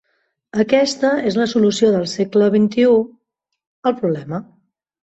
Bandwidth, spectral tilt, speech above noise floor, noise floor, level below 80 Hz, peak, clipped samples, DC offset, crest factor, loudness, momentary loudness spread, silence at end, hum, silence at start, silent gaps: 8.2 kHz; -5.5 dB/octave; 59 dB; -75 dBFS; -60 dBFS; -2 dBFS; under 0.1%; under 0.1%; 16 dB; -17 LUFS; 11 LU; 0.6 s; none; 0.55 s; 3.67-3.83 s